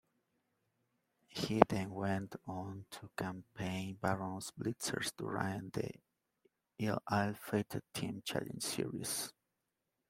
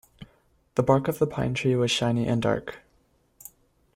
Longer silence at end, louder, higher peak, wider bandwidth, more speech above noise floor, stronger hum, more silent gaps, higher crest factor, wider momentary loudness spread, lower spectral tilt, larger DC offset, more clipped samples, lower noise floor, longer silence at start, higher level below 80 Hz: second, 0.8 s vs 1.2 s; second, -39 LUFS vs -25 LUFS; about the same, -4 dBFS vs -6 dBFS; about the same, 16 kHz vs 16 kHz; first, 49 dB vs 41 dB; neither; neither; first, 36 dB vs 20 dB; second, 11 LU vs 23 LU; about the same, -4.5 dB/octave vs -5.5 dB/octave; neither; neither; first, -87 dBFS vs -65 dBFS; first, 1.3 s vs 0.2 s; second, -68 dBFS vs -54 dBFS